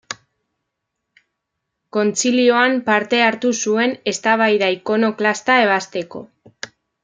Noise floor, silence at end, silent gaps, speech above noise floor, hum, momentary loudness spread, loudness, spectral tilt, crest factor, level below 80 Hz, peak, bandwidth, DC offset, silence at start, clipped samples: -78 dBFS; 0.35 s; none; 61 dB; none; 19 LU; -17 LUFS; -3 dB/octave; 18 dB; -70 dBFS; -2 dBFS; 9.6 kHz; under 0.1%; 0.1 s; under 0.1%